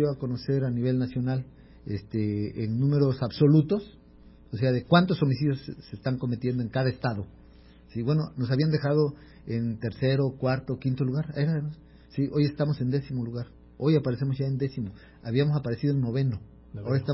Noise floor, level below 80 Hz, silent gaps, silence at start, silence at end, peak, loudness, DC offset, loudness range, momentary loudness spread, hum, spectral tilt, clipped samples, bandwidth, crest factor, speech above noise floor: -52 dBFS; -54 dBFS; none; 0 s; 0 s; -6 dBFS; -27 LUFS; under 0.1%; 4 LU; 13 LU; none; -12 dB/octave; under 0.1%; 5.8 kHz; 20 dB; 26 dB